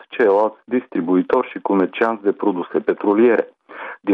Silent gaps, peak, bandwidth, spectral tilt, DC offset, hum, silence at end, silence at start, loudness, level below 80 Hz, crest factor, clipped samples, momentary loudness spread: none; -4 dBFS; 4.9 kHz; -8.5 dB/octave; under 0.1%; none; 0 s; 0.1 s; -18 LUFS; -68 dBFS; 14 dB; under 0.1%; 10 LU